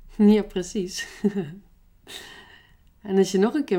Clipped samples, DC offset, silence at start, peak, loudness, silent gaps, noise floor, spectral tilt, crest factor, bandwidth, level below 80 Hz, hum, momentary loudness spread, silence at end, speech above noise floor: under 0.1%; under 0.1%; 0.1 s; -6 dBFS; -23 LUFS; none; -54 dBFS; -6 dB/octave; 18 dB; 15 kHz; -52 dBFS; none; 21 LU; 0 s; 32 dB